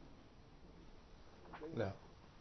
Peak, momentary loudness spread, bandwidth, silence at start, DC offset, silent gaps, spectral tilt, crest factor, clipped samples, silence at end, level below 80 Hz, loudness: -28 dBFS; 19 LU; 6.2 kHz; 0 s; under 0.1%; none; -6 dB/octave; 24 dB; under 0.1%; 0 s; -64 dBFS; -47 LUFS